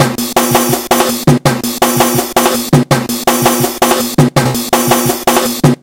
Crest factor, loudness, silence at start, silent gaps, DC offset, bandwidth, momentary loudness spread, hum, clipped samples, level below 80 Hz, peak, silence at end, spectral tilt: 12 dB; -11 LUFS; 0 s; none; 0.2%; over 20 kHz; 2 LU; none; 0.7%; -40 dBFS; 0 dBFS; 0.05 s; -4.5 dB/octave